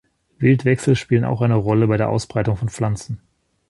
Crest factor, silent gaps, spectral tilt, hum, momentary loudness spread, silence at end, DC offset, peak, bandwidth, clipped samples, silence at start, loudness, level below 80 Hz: 16 dB; none; -7.5 dB/octave; none; 7 LU; 0.5 s; under 0.1%; -2 dBFS; 11.5 kHz; under 0.1%; 0.4 s; -19 LUFS; -44 dBFS